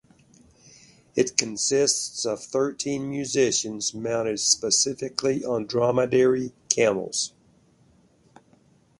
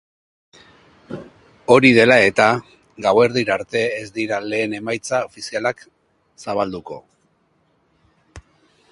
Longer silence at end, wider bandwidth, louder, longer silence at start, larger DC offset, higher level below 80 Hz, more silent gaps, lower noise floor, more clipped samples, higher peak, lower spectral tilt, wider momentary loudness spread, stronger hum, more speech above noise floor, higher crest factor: first, 1.7 s vs 0.5 s; about the same, 11.5 kHz vs 11.5 kHz; second, -24 LUFS vs -17 LUFS; about the same, 1.15 s vs 1.1 s; neither; second, -64 dBFS vs -56 dBFS; neither; about the same, -60 dBFS vs -63 dBFS; neither; about the same, 0 dBFS vs 0 dBFS; second, -2.5 dB/octave vs -5 dB/octave; second, 8 LU vs 24 LU; neither; second, 35 dB vs 45 dB; first, 26 dB vs 20 dB